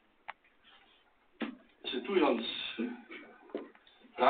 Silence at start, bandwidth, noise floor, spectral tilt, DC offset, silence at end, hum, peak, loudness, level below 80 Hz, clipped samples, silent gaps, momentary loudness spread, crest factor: 0.3 s; 4.6 kHz; -67 dBFS; -1.5 dB/octave; under 0.1%; 0 s; none; -12 dBFS; -36 LUFS; -76 dBFS; under 0.1%; none; 21 LU; 24 dB